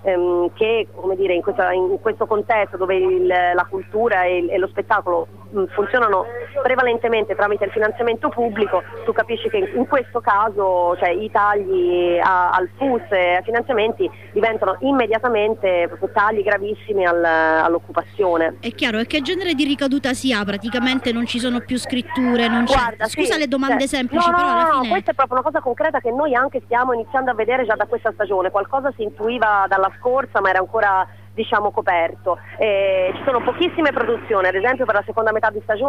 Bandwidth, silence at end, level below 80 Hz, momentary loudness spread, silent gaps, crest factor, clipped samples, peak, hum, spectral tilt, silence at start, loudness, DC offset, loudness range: 15 kHz; 0 s; -50 dBFS; 5 LU; none; 14 dB; under 0.1%; -6 dBFS; 50 Hz at -45 dBFS; -4.5 dB/octave; 0 s; -19 LUFS; 0.5%; 2 LU